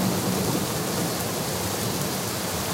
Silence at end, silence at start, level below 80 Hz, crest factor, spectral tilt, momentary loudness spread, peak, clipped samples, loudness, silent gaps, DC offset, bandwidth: 0 s; 0 s; -50 dBFS; 16 dB; -4 dB/octave; 2 LU; -12 dBFS; under 0.1%; -26 LUFS; none; under 0.1%; 16.5 kHz